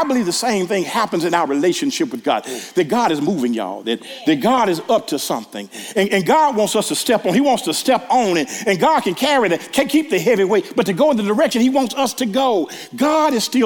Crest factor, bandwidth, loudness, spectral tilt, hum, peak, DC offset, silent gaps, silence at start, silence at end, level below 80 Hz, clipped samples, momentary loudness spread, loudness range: 16 dB; 18 kHz; -17 LUFS; -4 dB/octave; none; 0 dBFS; under 0.1%; none; 0 s; 0 s; -62 dBFS; under 0.1%; 6 LU; 3 LU